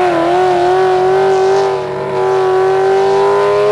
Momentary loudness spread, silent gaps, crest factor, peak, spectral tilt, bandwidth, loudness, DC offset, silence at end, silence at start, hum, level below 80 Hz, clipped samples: 4 LU; none; 8 dB; -4 dBFS; -5.5 dB/octave; 11 kHz; -12 LUFS; under 0.1%; 0 s; 0 s; none; -48 dBFS; under 0.1%